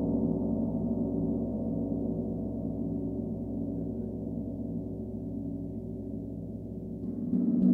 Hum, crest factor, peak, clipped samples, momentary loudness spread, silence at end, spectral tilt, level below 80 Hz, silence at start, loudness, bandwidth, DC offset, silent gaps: none; 16 dB; -16 dBFS; under 0.1%; 9 LU; 0 s; -13 dB/octave; -48 dBFS; 0 s; -34 LUFS; 1.4 kHz; under 0.1%; none